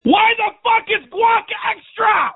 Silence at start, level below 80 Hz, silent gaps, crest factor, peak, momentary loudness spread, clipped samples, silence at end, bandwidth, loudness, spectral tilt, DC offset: 0.05 s; -56 dBFS; none; 16 dB; 0 dBFS; 9 LU; under 0.1%; 0.05 s; 4.1 kHz; -16 LUFS; -8 dB/octave; under 0.1%